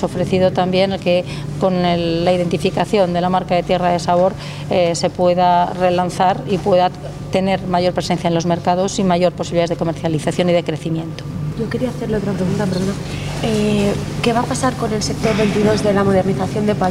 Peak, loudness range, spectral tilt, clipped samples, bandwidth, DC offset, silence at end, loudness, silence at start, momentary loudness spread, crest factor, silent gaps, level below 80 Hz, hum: -2 dBFS; 4 LU; -6 dB/octave; under 0.1%; 15 kHz; under 0.1%; 0 s; -17 LUFS; 0 s; 6 LU; 14 dB; none; -40 dBFS; none